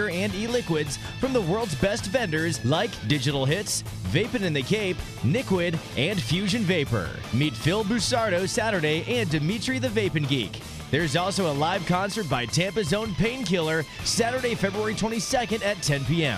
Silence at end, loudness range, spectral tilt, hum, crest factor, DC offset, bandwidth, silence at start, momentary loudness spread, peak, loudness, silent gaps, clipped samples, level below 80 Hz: 0 s; 1 LU; -4.5 dB/octave; none; 18 dB; under 0.1%; 15 kHz; 0 s; 4 LU; -8 dBFS; -25 LUFS; none; under 0.1%; -46 dBFS